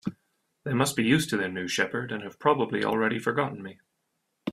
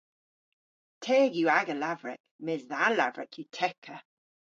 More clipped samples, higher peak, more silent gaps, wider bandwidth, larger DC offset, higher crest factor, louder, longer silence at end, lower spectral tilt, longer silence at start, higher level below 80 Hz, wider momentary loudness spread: neither; about the same, -8 dBFS vs -10 dBFS; second, none vs 2.20-2.24 s, 2.31-2.39 s, 3.78-3.82 s; first, 15.5 kHz vs 7.6 kHz; neither; about the same, 22 dB vs 20 dB; about the same, -27 LUFS vs -28 LUFS; second, 0 s vs 0.6 s; about the same, -4.5 dB/octave vs -4.5 dB/octave; second, 0.05 s vs 1 s; first, -64 dBFS vs -86 dBFS; about the same, 15 LU vs 17 LU